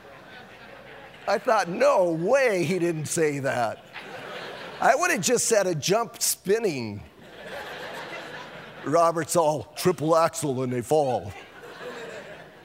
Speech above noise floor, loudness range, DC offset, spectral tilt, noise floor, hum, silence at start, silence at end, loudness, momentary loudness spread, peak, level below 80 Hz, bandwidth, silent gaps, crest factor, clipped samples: 22 dB; 3 LU; under 0.1%; -4 dB/octave; -45 dBFS; none; 0.05 s; 0.05 s; -24 LUFS; 21 LU; -4 dBFS; -64 dBFS; 16 kHz; none; 22 dB; under 0.1%